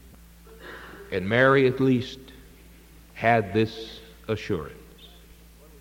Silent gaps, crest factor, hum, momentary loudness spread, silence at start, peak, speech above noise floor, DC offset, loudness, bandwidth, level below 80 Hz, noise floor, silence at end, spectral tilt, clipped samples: none; 20 dB; none; 24 LU; 0.5 s; -6 dBFS; 27 dB; under 0.1%; -24 LUFS; 17 kHz; -52 dBFS; -50 dBFS; 0.75 s; -7 dB/octave; under 0.1%